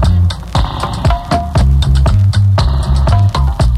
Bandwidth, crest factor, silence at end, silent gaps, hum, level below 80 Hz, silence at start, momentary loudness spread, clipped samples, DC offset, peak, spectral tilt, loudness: 11 kHz; 10 dB; 0 s; none; none; -14 dBFS; 0 s; 5 LU; under 0.1%; under 0.1%; 0 dBFS; -6.5 dB/octave; -13 LUFS